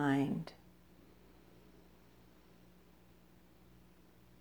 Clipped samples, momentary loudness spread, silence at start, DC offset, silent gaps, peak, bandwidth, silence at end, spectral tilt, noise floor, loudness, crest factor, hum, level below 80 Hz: under 0.1%; 26 LU; 0 s; under 0.1%; none; -20 dBFS; over 20 kHz; 3.9 s; -7.5 dB/octave; -64 dBFS; -38 LUFS; 24 dB; 60 Hz at -75 dBFS; -70 dBFS